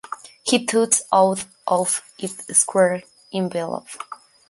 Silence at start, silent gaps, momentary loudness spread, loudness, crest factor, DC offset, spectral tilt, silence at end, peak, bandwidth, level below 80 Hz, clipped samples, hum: 0.1 s; none; 14 LU; -20 LUFS; 20 dB; under 0.1%; -3 dB/octave; 0.35 s; -2 dBFS; 12 kHz; -68 dBFS; under 0.1%; none